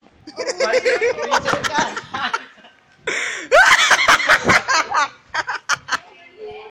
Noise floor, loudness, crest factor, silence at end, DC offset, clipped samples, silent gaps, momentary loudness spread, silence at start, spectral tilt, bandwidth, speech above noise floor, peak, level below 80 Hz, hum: -49 dBFS; -16 LUFS; 14 dB; 0 s; under 0.1%; under 0.1%; none; 14 LU; 0.25 s; -1.5 dB/octave; 17.5 kHz; 30 dB; -4 dBFS; -52 dBFS; none